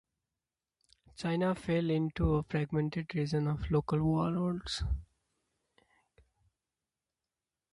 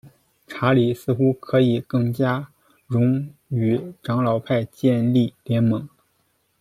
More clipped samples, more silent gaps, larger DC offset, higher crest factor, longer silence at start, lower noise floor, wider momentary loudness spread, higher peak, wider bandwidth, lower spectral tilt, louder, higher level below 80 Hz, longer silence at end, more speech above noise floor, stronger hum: neither; neither; neither; about the same, 18 dB vs 16 dB; first, 1.2 s vs 0.05 s; first, under -90 dBFS vs -67 dBFS; about the same, 5 LU vs 7 LU; second, -18 dBFS vs -4 dBFS; second, 11.5 kHz vs 14 kHz; about the same, -7.5 dB/octave vs -8.5 dB/octave; second, -33 LUFS vs -21 LUFS; first, -46 dBFS vs -60 dBFS; first, 2.7 s vs 0.75 s; first, over 58 dB vs 47 dB; neither